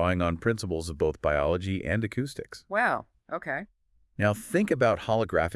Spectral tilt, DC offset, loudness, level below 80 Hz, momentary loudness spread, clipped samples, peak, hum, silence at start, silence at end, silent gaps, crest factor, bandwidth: -6 dB/octave; under 0.1%; -28 LUFS; -50 dBFS; 11 LU; under 0.1%; -10 dBFS; none; 0 s; 0 s; none; 18 dB; 12 kHz